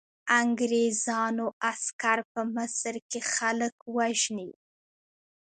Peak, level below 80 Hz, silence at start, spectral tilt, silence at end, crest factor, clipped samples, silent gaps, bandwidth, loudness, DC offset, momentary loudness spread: -10 dBFS; -78 dBFS; 0.25 s; -2 dB/octave; 0.9 s; 20 dB; under 0.1%; 1.53-1.61 s, 1.93-1.99 s, 2.25-2.35 s, 3.02-3.10 s, 3.72-3.86 s; 9.6 kHz; -28 LUFS; under 0.1%; 8 LU